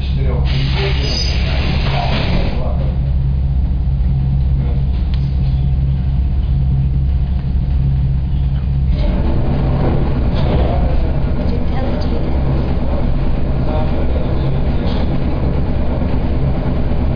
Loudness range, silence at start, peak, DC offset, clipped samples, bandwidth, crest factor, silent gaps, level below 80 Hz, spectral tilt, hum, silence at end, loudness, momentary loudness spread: 2 LU; 0 s; -6 dBFS; 2%; under 0.1%; 5.2 kHz; 8 dB; none; -16 dBFS; -8 dB/octave; none; 0 s; -17 LUFS; 3 LU